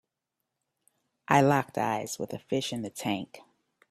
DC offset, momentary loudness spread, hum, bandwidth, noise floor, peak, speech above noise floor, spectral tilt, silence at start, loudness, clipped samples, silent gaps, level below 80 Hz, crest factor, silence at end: under 0.1%; 13 LU; none; 15.5 kHz; -85 dBFS; -6 dBFS; 57 dB; -5 dB/octave; 1.3 s; -29 LUFS; under 0.1%; none; -68 dBFS; 24 dB; 0.5 s